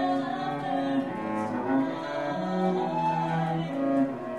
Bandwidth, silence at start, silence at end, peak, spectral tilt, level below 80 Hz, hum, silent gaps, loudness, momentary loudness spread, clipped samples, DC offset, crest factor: 10 kHz; 0 s; 0 s; -14 dBFS; -7.5 dB/octave; -68 dBFS; none; none; -28 LUFS; 4 LU; under 0.1%; 0.1%; 14 dB